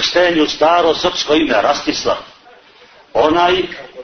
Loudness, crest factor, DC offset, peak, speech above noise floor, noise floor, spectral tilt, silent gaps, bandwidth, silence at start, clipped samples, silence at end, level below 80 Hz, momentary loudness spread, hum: -14 LUFS; 14 dB; under 0.1%; 0 dBFS; 31 dB; -45 dBFS; -3 dB/octave; none; 6.6 kHz; 0 s; under 0.1%; 0 s; -46 dBFS; 8 LU; none